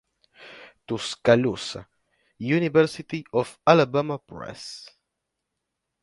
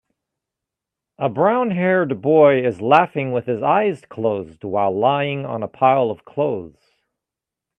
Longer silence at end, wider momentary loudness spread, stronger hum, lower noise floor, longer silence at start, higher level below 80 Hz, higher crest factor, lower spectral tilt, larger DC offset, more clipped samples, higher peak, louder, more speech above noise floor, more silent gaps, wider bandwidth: about the same, 1.15 s vs 1.1 s; first, 20 LU vs 10 LU; neither; second, -82 dBFS vs -86 dBFS; second, 0.4 s vs 1.2 s; about the same, -62 dBFS vs -64 dBFS; about the same, 24 dB vs 20 dB; second, -6 dB/octave vs -8.5 dB/octave; neither; neither; about the same, -2 dBFS vs 0 dBFS; second, -23 LUFS vs -19 LUFS; second, 58 dB vs 68 dB; neither; first, 11.5 kHz vs 8.8 kHz